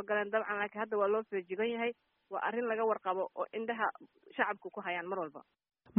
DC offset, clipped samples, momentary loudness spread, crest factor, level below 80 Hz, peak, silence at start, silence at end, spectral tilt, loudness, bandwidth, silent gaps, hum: under 0.1%; under 0.1%; 8 LU; 20 dB; -86 dBFS; -16 dBFS; 0 s; 0 s; -2.5 dB/octave; -36 LUFS; 3.8 kHz; none; none